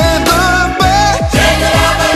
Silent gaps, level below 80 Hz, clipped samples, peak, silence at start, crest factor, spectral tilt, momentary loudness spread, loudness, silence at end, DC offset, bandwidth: none; -20 dBFS; under 0.1%; 0 dBFS; 0 s; 10 dB; -4 dB/octave; 1 LU; -10 LUFS; 0 s; under 0.1%; 14 kHz